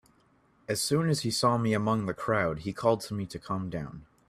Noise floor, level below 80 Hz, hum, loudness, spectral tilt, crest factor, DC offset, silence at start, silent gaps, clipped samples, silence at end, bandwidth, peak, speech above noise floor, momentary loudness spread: -65 dBFS; -58 dBFS; none; -29 LUFS; -5 dB/octave; 20 dB; under 0.1%; 0.7 s; none; under 0.1%; 0.25 s; 15 kHz; -10 dBFS; 36 dB; 10 LU